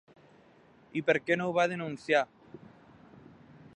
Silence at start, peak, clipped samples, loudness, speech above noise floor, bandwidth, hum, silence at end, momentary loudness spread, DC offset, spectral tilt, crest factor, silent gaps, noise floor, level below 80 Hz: 0.95 s; -12 dBFS; under 0.1%; -30 LUFS; 31 dB; 9.8 kHz; none; 1.2 s; 15 LU; under 0.1%; -5.5 dB/octave; 22 dB; none; -60 dBFS; -74 dBFS